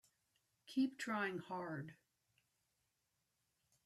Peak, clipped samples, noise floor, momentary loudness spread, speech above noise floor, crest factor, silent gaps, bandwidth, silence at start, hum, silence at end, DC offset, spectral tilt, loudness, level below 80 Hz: -28 dBFS; under 0.1%; -86 dBFS; 9 LU; 44 dB; 20 dB; none; 13.5 kHz; 0.65 s; none; 1.9 s; under 0.1%; -5.5 dB/octave; -43 LUFS; -88 dBFS